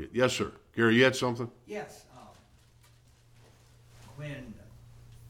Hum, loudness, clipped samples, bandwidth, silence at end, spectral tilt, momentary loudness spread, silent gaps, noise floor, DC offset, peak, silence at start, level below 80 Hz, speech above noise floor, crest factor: none; -29 LUFS; under 0.1%; 16.5 kHz; 0.05 s; -5 dB/octave; 27 LU; none; -60 dBFS; under 0.1%; -10 dBFS; 0 s; -60 dBFS; 31 dB; 22 dB